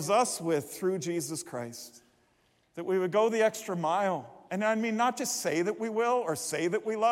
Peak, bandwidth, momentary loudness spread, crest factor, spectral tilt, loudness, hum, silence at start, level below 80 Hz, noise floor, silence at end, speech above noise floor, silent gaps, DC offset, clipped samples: -12 dBFS; 16.5 kHz; 12 LU; 18 dB; -4 dB/octave; -30 LUFS; none; 0 s; -78 dBFS; -69 dBFS; 0 s; 40 dB; none; under 0.1%; under 0.1%